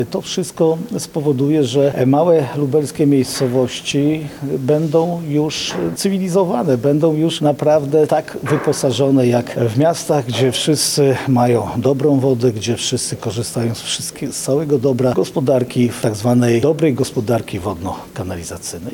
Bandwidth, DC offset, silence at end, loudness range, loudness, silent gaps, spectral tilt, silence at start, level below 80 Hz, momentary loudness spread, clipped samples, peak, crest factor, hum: 19 kHz; under 0.1%; 0 s; 3 LU; -17 LUFS; none; -5.5 dB/octave; 0 s; -52 dBFS; 8 LU; under 0.1%; -4 dBFS; 12 dB; none